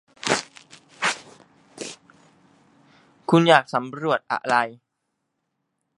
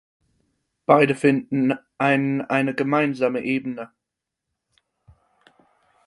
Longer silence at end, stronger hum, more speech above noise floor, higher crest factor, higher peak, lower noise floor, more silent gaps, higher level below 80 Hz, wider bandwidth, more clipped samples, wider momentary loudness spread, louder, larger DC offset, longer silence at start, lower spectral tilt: second, 1.25 s vs 2.2 s; neither; second, 58 dB vs 63 dB; about the same, 24 dB vs 22 dB; about the same, 0 dBFS vs -2 dBFS; second, -78 dBFS vs -84 dBFS; neither; about the same, -68 dBFS vs -66 dBFS; about the same, 11.5 kHz vs 11.5 kHz; neither; first, 20 LU vs 13 LU; about the same, -22 LUFS vs -21 LUFS; neither; second, 0.25 s vs 0.9 s; second, -4.5 dB/octave vs -7 dB/octave